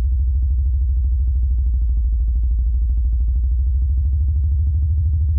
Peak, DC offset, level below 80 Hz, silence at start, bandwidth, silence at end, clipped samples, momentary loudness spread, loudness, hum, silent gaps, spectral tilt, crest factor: -10 dBFS; under 0.1%; -18 dBFS; 0 s; 0.4 kHz; 0 s; under 0.1%; 1 LU; -20 LUFS; none; none; -14 dB/octave; 6 dB